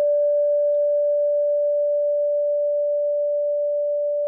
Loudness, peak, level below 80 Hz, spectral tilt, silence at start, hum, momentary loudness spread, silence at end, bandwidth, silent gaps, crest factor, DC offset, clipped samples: -21 LUFS; -16 dBFS; under -90 dBFS; 3 dB/octave; 0 s; none; 3 LU; 0 s; 1.7 kHz; none; 6 dB; under 0.1%; under 0.1%